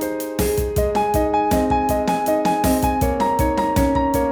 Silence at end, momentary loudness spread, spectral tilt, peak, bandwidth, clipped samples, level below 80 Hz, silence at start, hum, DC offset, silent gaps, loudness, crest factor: 0 s; 2 LU; -6 dB/octave; -6 dBFS; over 20 kHz; under 0.1%; -30 dBFS; 0 s; none; under 0.1%; none; -19 LUFS; 14 dB